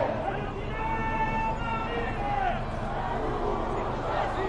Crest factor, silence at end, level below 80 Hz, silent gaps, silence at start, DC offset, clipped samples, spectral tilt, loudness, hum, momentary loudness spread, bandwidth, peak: 16 dB; 0 s; -36 dBFS; none; 0 s; under 0.1%; under 0.1%; -7 dB/octave; -30 LUFS; none; 4 LU; 9.8 kHz; -14 dBFS